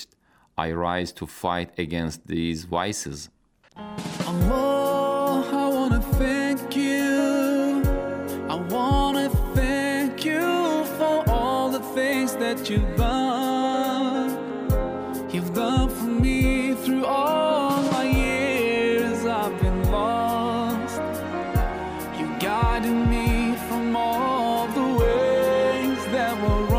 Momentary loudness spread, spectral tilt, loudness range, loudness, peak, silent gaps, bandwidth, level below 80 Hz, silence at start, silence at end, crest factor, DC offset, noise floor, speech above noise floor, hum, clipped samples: 7 LU; -6 dB/octave; 3 LU; -24 LUFS; -8 dBFS; none; 16 kHz; -32 dBFS; 0 s; 0 s; 14 dB; under 0.1%; -61 dBFS; 35 dB; none; under 0.1%